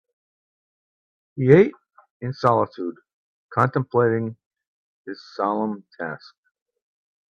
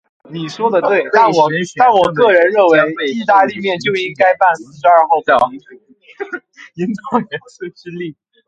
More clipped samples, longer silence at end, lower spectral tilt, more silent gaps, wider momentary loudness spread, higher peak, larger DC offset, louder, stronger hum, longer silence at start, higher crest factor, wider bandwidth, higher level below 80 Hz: neither; first, 1.15 s vs 0.35 s; first, -9 dB/octave vs -5.5 dB/octave; first, 2.10-2.20 s, 3.13-3.49 s, 4.46-4.51 s, 4.67-5.05 s vs none; first, 20 LU vs 17 LU; about the same, 0 dBFS vs 0 dBFS; neither; second, -22 LUFS vs -13 LUFS; neither; first, 1.35 s vs 0.3 s; first, 24 dB vs 14 dB; second, 7 kHz vs 9 kHz; about the same, -62 dBFS vs -58 dBFS